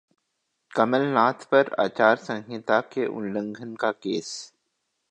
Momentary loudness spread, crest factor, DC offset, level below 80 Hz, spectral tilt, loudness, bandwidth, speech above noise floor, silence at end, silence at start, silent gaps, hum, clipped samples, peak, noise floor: 11 LU; 22 dB; under 0.1%; -74 dBFS; -5 dB/octave; -24 LUFS; 9.6 kHz; 53 dB; 0.65 s; 0.75 s; none; none; under 0.1%; -4 dBFS; -77 dBFS